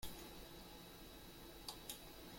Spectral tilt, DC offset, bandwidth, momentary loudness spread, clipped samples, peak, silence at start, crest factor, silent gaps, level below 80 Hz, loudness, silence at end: -3 dB/octave; under 0.1%; 16.5 kHz; 5 LU; under 0.1%; -32 dBFS; 0 s; 22 dB; none; -64 dBFS; -54 LUFS; 0 s